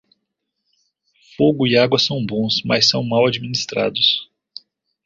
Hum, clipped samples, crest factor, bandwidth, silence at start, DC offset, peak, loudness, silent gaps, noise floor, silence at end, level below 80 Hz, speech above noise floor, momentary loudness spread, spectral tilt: none; under 0.1%; 18 dB; 7.8 kHz; 1.4 s; under 0.1%; -2 dBFS; -17 LUFS; none; -76 dBFS; 0.8 s; -56 dBFS; 59 dB; 17 LU; -4.5 dB/octave